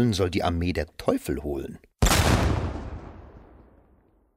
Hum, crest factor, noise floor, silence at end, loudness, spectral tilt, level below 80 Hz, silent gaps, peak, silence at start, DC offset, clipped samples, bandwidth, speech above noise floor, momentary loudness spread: none; 20 dB; -61 dBFS; 0.95 s; -25 LUFS; -5 dB/octave; -34 dBFS; none; -6 dBFS; 0 s; under 0.1%; under 0.1%; 16 kHz; 35 dB; 19 LU